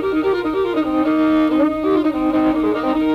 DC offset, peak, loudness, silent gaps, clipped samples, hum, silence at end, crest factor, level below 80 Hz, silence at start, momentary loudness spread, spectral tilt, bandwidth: under 0.1%; -6 dBFS; -17 LUFS; none; under 0.1%; none; 0 s; 10 dB; -44 dBFS; 0 s; 3 LU; -7 dB/octave; 5.4 kHz